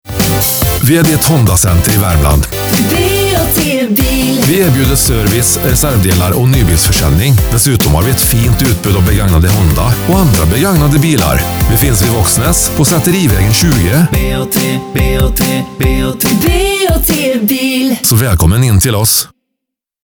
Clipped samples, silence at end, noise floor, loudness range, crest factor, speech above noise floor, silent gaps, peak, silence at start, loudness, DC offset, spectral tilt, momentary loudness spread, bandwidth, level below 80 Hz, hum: under 0.1%; 0.8 s; -77 dBFS; 2 LU; 10 dB; 68 dB; none; 0 dBFS; 0.05 s; -9 LUFS; under 0.1%; -4.5 dB/octave; 3 LU; over 20 kHz; -18 dBFS; none